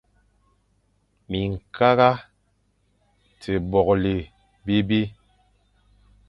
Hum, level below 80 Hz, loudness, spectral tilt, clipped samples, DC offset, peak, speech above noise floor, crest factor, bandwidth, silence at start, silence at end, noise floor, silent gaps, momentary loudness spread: 50 Hz at -45 dBFS; -46 dBFS; -22 LUFS; -8 dB/octave; under 0.1%; under 0.1%; -2 dBFS; 46 dB; 22 dB; 10.5 kHz; 1.3 s; 1.15 s; -67 dBFS; none; 14 LU